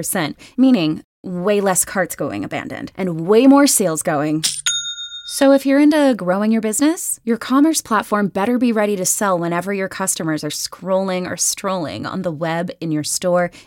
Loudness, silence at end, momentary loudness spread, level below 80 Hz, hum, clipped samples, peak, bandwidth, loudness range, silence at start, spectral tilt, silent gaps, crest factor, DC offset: -17 LUFS; 0.05 s; 11 LU; -58 dBFS; none; under 0.1%; -2 dBFS; 17 kHz; 5 LU; 0 s; -4 dB/octave; 1.04-1.23 s; 16 dB; under 0.1%